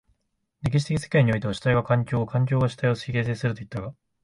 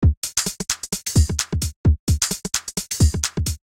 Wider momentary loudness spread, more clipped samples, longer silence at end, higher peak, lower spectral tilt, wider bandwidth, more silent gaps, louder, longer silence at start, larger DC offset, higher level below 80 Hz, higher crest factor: first, 11 LU vs 5 LU; neither; first, 0.3 s vs 0.15 s; second, -8 dBFS vs -2 dBFS; first, -7 dB/octave vs -4 dB/octave; second, 11 kHz vs 17 kHz; second, none vs 0.17-0.22 s, 1.76-1.84 s, 1.99-2.07 s; about the same, -24 LUFS vs -22 LUFS; first, 0.65 s vs 0 s; neither; second, -50 dBFS vs -26 dBFS; about the same, 16 dB vs 18 dB